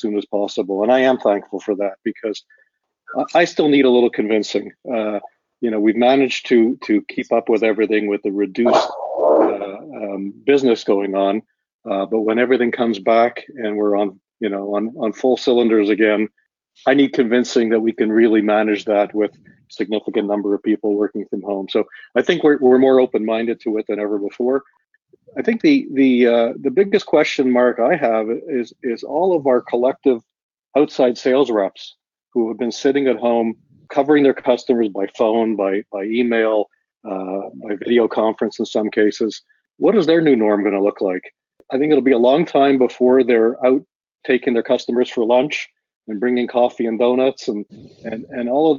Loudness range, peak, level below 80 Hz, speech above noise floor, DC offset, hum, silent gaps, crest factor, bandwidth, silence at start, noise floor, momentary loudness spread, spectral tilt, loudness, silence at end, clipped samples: 3 LU; 0 dBFS; -66 dBFS; 36 dB; under 0.1%; none; 11.74-11.79 s, 30.43-30.49 s, 43.95-44.00 s, 45.96-46.01 s; 16 dB; 7.4 kHz; 0.05 s; -53 dBFS; 11 LU; -4 dB/octave; -18 LUFS; 0 s; under 0.1%